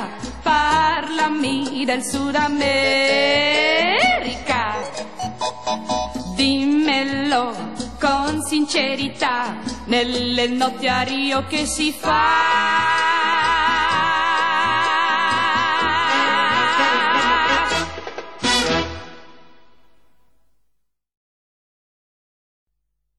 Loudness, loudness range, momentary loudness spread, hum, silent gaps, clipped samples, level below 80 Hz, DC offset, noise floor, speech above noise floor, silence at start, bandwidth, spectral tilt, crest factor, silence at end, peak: -18 LUFS; 4 LU; 10 LU; none; 21.17-22.67 s; under 0.1%; -46 dBFS; 0.9%; -75 dBFS; 56 dB; 0 s; 14 kHz; -3 dB/octave; 16 dB; 0 s; -4 dBFS